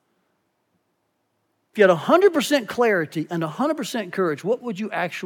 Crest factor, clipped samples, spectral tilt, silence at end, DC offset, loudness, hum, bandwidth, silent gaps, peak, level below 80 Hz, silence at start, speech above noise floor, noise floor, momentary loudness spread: 20 dB; under 0.1%; -5 dB/octave; 0 s; under 0.1%; -21 LUFS; none; 18 kHz; none; -2 dBFS; -80 dBFS; 1.75 s; 51 dB; -72 dBFS; 10 LU